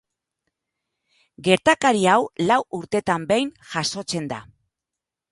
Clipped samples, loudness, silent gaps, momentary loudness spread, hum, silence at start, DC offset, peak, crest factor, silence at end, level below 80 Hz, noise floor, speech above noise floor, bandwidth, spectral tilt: under 0.1%; -21 LUFS; none; 10 LU; none; 1.4 s; under 0.1%; 0 dBFS; 22 dB; 0.9 s; -60 dBFS; -86 dBFS; 65 dB; 11.5 kHz; -4 dB/octave